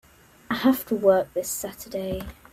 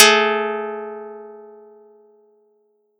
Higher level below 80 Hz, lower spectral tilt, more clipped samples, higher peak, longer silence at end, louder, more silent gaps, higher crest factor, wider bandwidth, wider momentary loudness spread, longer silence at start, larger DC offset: first, -50 dBFS vs -80 dBFS; first, -4.5 dB/octave vs 0 dB/octave; neither; second, -6 dBFS vs 0 dBFS; second, 0.2 s vs 1.55 s; second, -25 LUFS vs -18 LUFS; neither; about the same, 20 dB vs 22 dB; about the same, 16 kHz vs 15.5 kHz; second, 12 LU vs 25 LU; first, 0.5 s vs 0 s; neither